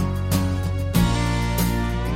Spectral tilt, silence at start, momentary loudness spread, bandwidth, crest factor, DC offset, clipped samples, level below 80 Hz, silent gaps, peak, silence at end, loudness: -5.5 dB/octave; 0 s; 4 LU; 16.5 kHz; 14 dB; under 0.1%; under 0.1%; -28 dBFS; none; -6 dBFS; 0 s; -22 LUFS